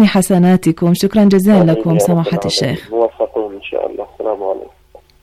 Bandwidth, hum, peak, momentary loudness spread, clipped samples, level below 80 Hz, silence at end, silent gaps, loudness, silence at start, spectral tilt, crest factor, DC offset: 15 kHz; none; -2 dBFS; 12 LU; under 0.1%; -46 dBFS; 0.6 s; none; -14 LUFS; 0 s; -6.5 dB/octave; 12 dB; under 0.1%